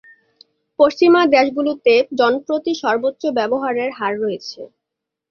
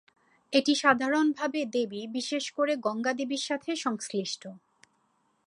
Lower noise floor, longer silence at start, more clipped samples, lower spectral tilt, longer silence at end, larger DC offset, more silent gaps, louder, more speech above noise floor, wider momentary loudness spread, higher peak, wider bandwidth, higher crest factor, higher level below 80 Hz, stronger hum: first, -82 dBFS vs -72 dBFS; first, 0.8 s vs 0.5 s; neither; first, -4.5 dB/octave vs -3 dB/octave; second, 0.65 s vs 0.9 s; neither; neither; first, -17 LUFS vs -29 LUFS; first, 65 dB vs 43 dB; about the same, 11 LU vs 9 LU; first, 0 dBFS vs -6 dBFS; second, 6.8 kHz vs 11.5 kHz; second, 16 dB vs 24 dB; first, -64 dBFS vs -78 dBFS; neither